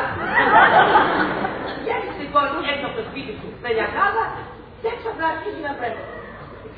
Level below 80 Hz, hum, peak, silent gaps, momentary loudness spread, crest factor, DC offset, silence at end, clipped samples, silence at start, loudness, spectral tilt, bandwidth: -48 dBFS; none; -2 dBFS; none; 19 LU; 18 dB; under 0.1%; 0 s; under 0.1%; 0 s; -20 LUFS; -8 dB/octave; 5 kHz